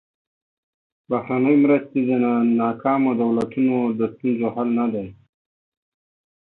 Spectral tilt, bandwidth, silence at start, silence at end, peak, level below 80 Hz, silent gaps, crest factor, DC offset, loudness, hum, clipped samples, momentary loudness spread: -9.5 dB/octave; 4.1 kHz; 1.1 s; 1.45 s; -6 dBFS; -64 dBFS; none; 16 dB; under 0.1%; -20 LUFS; none; under 0.1%; 8 LU